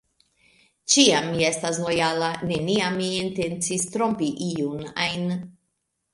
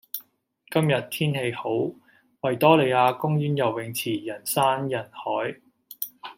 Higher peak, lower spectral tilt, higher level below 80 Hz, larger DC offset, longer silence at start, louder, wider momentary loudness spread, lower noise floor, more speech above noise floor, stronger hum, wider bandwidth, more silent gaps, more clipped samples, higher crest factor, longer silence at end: about the same, -2 dBFS vs -4 dBFS; second, -3.5 dB/octave vs -5.5 dB/octave; first, -58 dBFS vs -70 dBFS; neither; first, 0.85 s vs 0.15 s; about the same, -23 LUFS vs -24 LUFS; second, 11 LU vs 14 LU; first, -76 dBFS vs -62 dBFS; first, 53 dB vs 38 dB; neither; second, 11.5 kHz vs 16.5 kHz; neither; neither; about the same, 22 dB vs 22 dB; first, 0.6 s vs 0.05 s